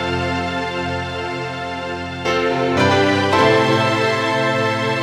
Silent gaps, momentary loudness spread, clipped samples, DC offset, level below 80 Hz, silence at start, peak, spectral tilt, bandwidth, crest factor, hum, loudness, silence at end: none; 11 LU; under 0.1%; under 0.1%; -46 dBFS; 0 s; -2 dBFS; -5 dB/octave; 15 kHz; 16 dB; none; -18 LUFS; 0 s